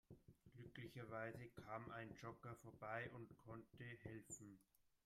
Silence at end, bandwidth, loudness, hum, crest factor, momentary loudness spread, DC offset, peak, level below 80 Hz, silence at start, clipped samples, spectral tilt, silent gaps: 0.2 s; 15.5 kHz; -56 LUFS; none; 20 dB; 11 LU; under 0.1%; -36 dBFS; -80 dBFS; 0.1 s; under 0.1%; -5 dB/octave; none